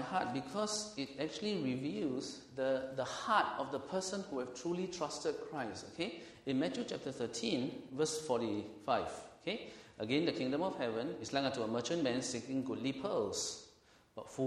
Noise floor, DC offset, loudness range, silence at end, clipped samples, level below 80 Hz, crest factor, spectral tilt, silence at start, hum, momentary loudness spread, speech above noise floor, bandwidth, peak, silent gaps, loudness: -66 dBFS; under 0.1%; 3 LU; 0 s; under 0.1%; -72 dBFS; 20 dB; -4 dB/octave; 0 s; none; 7 LU; 28 dB; 12.5 kHz; -18 dBFS; none; -38 LUFS